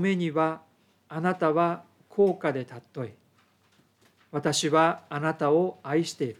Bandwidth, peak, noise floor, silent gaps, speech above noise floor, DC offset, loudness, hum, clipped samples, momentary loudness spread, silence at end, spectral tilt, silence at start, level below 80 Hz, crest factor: 15.5 kHz; -10 dBFS; -65 dBFS; none; 39 dB; under 0.1%; -26 LUFS; none; under 0.1%; 15 LU; 0.05 s; -5 dB/octave; 0 s; -80 dBFS; 18 dB